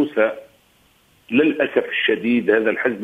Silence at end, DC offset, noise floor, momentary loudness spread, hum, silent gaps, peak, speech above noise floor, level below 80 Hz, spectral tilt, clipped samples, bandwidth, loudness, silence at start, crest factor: 0 s; under 0.1%; -57 dBFS; 5 LU; none; none; -2 dBFS; 39 dB; -64 dBFS; -6.5 dB/octave; under 0.1%; 8.2 kHz; -19 LUFS; 0 s; 18 dB